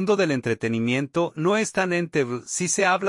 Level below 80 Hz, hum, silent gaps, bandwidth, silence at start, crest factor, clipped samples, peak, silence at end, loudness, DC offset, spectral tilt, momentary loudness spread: -64 dBFS; none; none; 11.5 kHz; 0 s; 16 dB; under 0.1%; -8 dBFS; 0 s; -23 LUFS; under 0.1%; -4.5 dB/octave; 5 LU